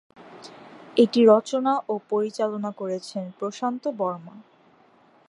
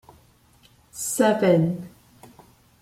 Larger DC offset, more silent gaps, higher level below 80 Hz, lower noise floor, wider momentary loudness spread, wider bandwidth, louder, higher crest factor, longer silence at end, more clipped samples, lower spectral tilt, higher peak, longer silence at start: neither; neither; second, -80 dBFS vs -62 dBFS; about the same, -57 dBFS vs -57 dBFS; about the same, 21 LU vs 22 LU; second, 11 kHz vs 16 kHz; about the same, -24 LUFS vs -22 LUFS; about the same, 20 dB vs 20 dB; about the same, 0.9 s vs 0.95 s; neither; about the same, -6 dB/octave vs -5.5 dB/octave; about the same, -4 dBFS vs -6 dBFS; second, 0.2 s vs 0.95 s